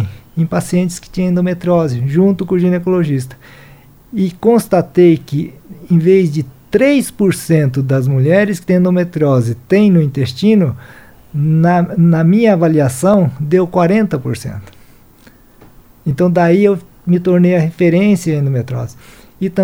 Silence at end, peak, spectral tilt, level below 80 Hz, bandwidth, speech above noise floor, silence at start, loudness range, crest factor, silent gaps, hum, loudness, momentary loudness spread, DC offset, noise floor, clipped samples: 0 s; 0 dBFS; -7.5 dB/octave; -46 dBFS; 16.5 kHz; 31 dB; 0 s; 3 LU; 12 dB; none; none; -13 LUFS; 11 LU; under 0.1%; -44 dBFS; under 0.1%